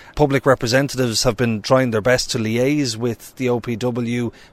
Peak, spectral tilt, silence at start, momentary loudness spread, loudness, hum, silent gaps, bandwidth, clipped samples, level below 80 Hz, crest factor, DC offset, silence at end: -2 dBFS; -5 dB/octave; 0 s; 7 LU; -19 LUFS; none; none; 16 kHz; under 0.1%; -40 dBFS; 16 dB; under 0.1%; 0.1 s